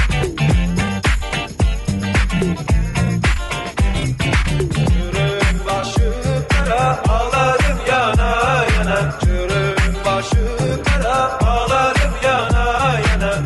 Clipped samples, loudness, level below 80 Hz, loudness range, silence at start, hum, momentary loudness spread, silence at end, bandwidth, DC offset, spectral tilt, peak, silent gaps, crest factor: under 0.1%; -17 LUFS; -20 dBFS; 2 LU; 0 s; none; 4 LU; 0 s; 12 kHz; under 0.1%; -5.5 dB/octave; -4 dBFS; none; 12 dB